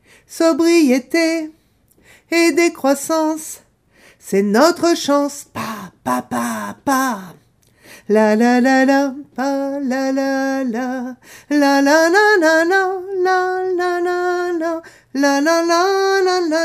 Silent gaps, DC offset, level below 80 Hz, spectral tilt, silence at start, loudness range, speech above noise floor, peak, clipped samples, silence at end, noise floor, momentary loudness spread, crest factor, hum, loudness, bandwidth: none; under 0.1%; -64 dBFS; -3.5 dB/octave; 0.3 s; 4 LU; 39 dB; 0 dBFS; under 0.1%; 0 s; -55 dBFS; 12 LU; 16 dB; none; -16 LUFS; 15.5 kHz